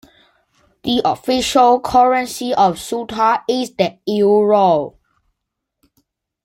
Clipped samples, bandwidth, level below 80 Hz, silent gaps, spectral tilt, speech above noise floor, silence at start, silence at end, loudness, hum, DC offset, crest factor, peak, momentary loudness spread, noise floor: under 0.1%; 16.5 kHz; -50 dBFS; none; -4.5 dB/octave; 63 dB; 0.85 s; 1.55 s; -16 LUFS; none; under 0.1%; 16 dB; -2 dBFS; 8 LU; -78 dBFS